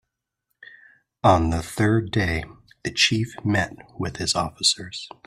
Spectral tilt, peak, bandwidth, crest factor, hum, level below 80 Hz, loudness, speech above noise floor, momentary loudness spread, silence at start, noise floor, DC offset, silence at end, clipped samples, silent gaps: -4 dB/octave; -2 dBFS; 14 kHz; 22 dB; none; -44 dBFS; -22 LUFS; 55 dB; 12 LU; 1.25 s; -78 dBFS; under 0.1%; 0.2 s; under 0.1%; none